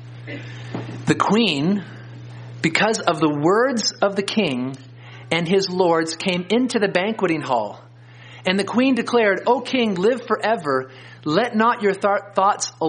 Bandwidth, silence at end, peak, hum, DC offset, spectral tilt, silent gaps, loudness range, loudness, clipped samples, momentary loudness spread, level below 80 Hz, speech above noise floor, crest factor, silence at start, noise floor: 10 kHz; 0 s; 0 dBFS; none; under 0.1%; -4.5 dB/octave; none; 1 LU; -20 LUFS; under 0.1%; 15 LU; -64 dBFS; 23 dB; 20 dB; 0 s; -43 dBFS